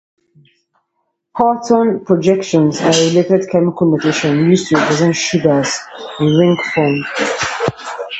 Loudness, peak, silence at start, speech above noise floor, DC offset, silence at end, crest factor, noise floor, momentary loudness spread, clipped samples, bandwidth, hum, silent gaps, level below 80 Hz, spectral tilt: -14 LUFS; 0 dBFS; 1.35 s; 56 dB; under 0.1%; 0 s; 14 dB; -69 dBFS; 6 LU; under 0.1%; 8.6 kHz; none; none; -52 dBFS; -5 dB/octave